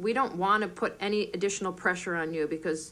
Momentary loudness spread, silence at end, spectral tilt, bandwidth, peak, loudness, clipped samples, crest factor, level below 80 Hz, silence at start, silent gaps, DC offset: 5 LU; 0 s; -4 dB/octave; 13 kHz; -12 dBFS; -29 LUFS; under 0.1%; 18 dB; -64 dBFS; 0 s; none; under 0.1%